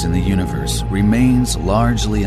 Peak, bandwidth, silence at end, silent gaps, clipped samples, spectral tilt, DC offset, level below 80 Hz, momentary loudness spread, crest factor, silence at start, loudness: -2 dBFS; 14 kHz; 0 s; none; under 0.1%; -6 dB/octave; under 0.1%; -24 dBFS; 6 LU; 14 dB; 0 s; -16 LUFS